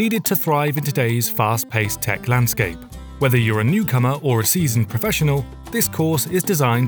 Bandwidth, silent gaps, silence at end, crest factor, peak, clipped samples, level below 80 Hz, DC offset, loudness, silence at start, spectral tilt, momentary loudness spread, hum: over 20 kHz; none; 0 s; 16 dB; -4 dBFS; under 0.1%; -42 dBFS; under 0.1%; -19 LUFS; 0 s; -5 dB/octave; 5 LU; none